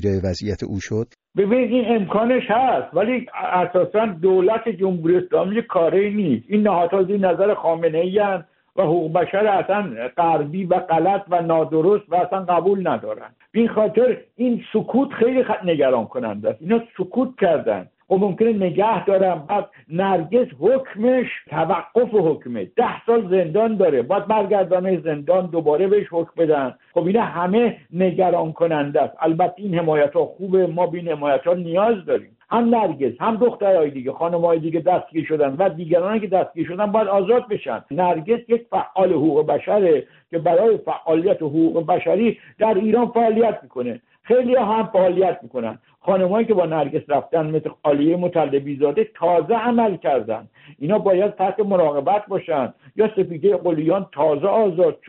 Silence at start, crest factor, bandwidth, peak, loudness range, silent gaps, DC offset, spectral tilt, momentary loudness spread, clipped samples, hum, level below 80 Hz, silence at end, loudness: 0 s; 14 dB; 4.3 kHz; -4 dBFS; 1 LU; none; under 0.1%; -6 dB/octave; 6 LU; under 0.1%; none; -60 dBFS; 0.15 s; -19 LUFS